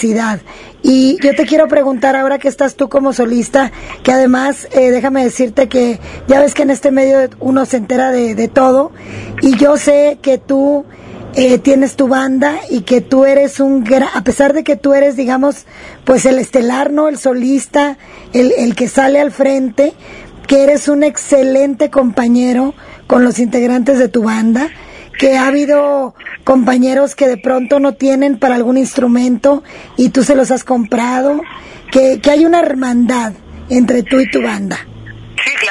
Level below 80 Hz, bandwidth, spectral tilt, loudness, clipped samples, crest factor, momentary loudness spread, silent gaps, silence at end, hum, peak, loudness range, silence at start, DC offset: -44 dBFS; 11.5 kHz; -4.5 dB/octave; -11 LUFS; 0.2%; 12 dB; 8 LU; none; 0 s; none; 0 dBFS; 1 LU; 0 s; under 0.1%